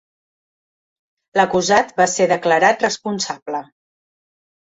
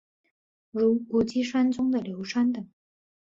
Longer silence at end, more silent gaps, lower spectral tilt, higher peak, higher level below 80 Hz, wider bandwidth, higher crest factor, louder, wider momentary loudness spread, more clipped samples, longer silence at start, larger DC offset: first, 1.1 s vs 0.7 s; first, 3.42-3.46 s vs none; second, -3 dB/octave vs -6 dB/octave; first, -2 dBFS vs -12 dBFS; about the same, -60 dBFS vs -64 dBFS; about the same, 8.2 kHz vs 7.6 kHz; about the same, 18 dB vs 14 dB; first, -17 LUFS vs -26 LUFS; about the same, 11 LU vs 11 LU; neither; first, 1.35 s vs 0.75 s; neither